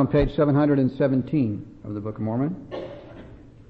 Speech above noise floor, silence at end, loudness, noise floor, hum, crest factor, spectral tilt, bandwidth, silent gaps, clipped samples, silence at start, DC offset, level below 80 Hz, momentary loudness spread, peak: 22 dB; 0.2 s; -23 LUFS; -44 dBFS; none; 14 dB; -10.5 dB/octave; 5 kHz; none; under 0.1%; 0 s; under 0.1%; -40 dBFS; 19 LU; -10 dBFS